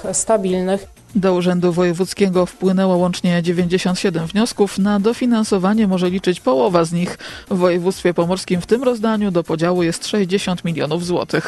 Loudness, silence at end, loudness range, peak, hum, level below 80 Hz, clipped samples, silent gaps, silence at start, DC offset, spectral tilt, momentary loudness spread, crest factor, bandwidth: -17 LUFS; 0 s; 1 LU; -2 dBFS; none; -48 dBFS; under 0.1%; none; 0 s; under 0.1%; -5.5 dB/octave; 4 LU; 16 dB; 12.5 kHz